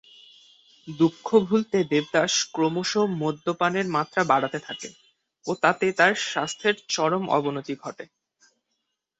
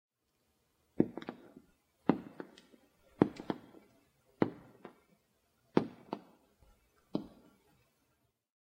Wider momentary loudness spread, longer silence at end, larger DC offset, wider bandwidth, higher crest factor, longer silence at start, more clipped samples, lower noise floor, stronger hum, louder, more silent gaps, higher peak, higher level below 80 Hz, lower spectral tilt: second, 15 LU vs 22 LU; second, 1.15 s vs 1.35 s; neither; second, 8.2 kHz vs 15.5 kHz; second, 22 dB vs 32 dB; second, 0.85 s vs 1 s; neither; about the same, -79 dBFS vs -79 dBFS; neither; first, -24 LUFS vs -37 LUFS; neither; first, -4 dBFS vs -10 dBFS; first, -68 dBFS vs -74 dBFS; second, -4 dB/octave vs -8.5 dB/octave